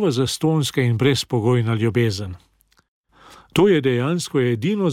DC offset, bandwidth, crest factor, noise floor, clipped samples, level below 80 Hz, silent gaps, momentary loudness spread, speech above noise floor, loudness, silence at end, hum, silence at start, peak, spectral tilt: under 0.1%; 16 kHz; 14 dB; -48 dBFS; under 0.1%; -54 dBFS; 2.88-3.04 s; 5 LU; 29 dB; -20 LUFS; 0 s; none; 0 s; -6 dBFS; -6 dB/octave